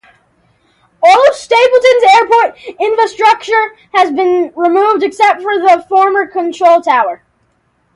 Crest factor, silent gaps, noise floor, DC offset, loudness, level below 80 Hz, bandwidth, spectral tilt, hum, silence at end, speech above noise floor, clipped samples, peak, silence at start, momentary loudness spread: 10 dB; none; -58 dBFS; under 0.1%; -10 LUFS; -60 dBFS; 11.5 kHz; -2 dB/octave; none; 0.8 s; 48 dB; under 0.1%; 0 dBFS; 1 s; 8 LU